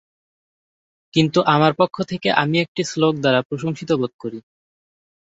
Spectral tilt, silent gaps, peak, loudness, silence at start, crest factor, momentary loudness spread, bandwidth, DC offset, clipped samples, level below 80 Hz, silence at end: -5.5 dB/octave; 2.68-2.75 s, 3.45-3.50 s, 4.14-4.19 s; -2 dBFS; -19 LUFS; 1.15 s; 20 dB; 10 LU; 8 kHz; under 0.1%; under 0.1%; -60 dBFS; 1 s